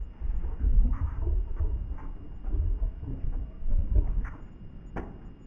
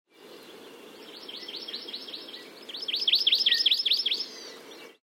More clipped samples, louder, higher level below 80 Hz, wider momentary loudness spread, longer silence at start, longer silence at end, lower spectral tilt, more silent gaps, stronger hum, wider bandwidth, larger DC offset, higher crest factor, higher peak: neither; second, -33 LUFS vs -24 LUFS; first, -28 dBFS vs -88 dBFS; second, 14 LU vs 26 LU; second, 0 s vs 0.2 s; about the same, 0 s vs 0.1 s; first, -10.5 dB/octave vs 0.5 dB/octave; neither; neither; second, 3 kHz vs 16 kHz; neither; about the same, 16 dB vs 18 dB; about the same, -12 dBFS vs -12 dBFS